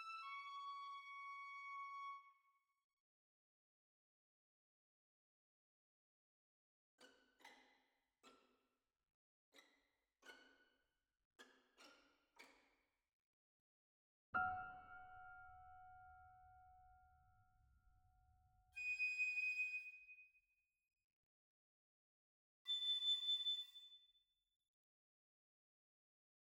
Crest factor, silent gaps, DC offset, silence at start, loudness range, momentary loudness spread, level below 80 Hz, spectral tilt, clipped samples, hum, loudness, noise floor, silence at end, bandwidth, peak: 24 dB; 2.84-6.98 s, 9.14-9.52 s, 11.25-11.31 s, 13.13-14.33 s, 21.04-22.65 s; under 0.1%; 0 s; 16 LU; 25 LU; -82 dBFS; -0.5 dB/octave; under 0.1%; none; -45 LUFS; under -90 dBFS; 2.4 s; 17 kHz; -30 dBFS